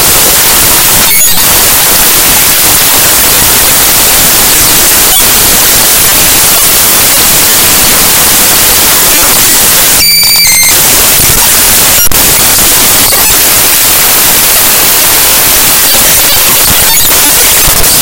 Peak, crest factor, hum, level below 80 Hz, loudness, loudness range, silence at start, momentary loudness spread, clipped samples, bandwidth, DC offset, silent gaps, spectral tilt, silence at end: 0 dBFS; 4 dB; none; -24 dBFS; -1 LUFS; 0 LU; 0 s; 1 LU; 20%; over 20 kHz; under 0.1%; none; -0.5 dB/octave; 0 s